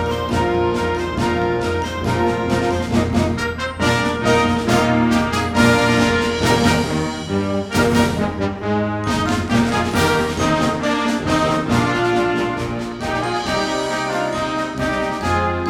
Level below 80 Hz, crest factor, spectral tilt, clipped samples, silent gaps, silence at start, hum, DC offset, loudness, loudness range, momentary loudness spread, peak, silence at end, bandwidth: -36 dBFS; 16 dB; -5.5 dB/octave; under 0.1%; none; 0 s; none; under 0.1%; -18 LUFS; 3 LU; 6 LU; -2 dBFS; 0 s; 17.5 kHz